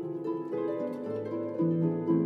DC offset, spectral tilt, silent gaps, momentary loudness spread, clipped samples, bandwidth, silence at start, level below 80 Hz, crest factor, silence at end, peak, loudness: under 0.1%; -11 dB/octave; none; 7 LU; under 0.1%; 4.5 kHz; 0 s; -82 dBFS; 14 dB; 0 s; -16 dBFS; -32 LUFS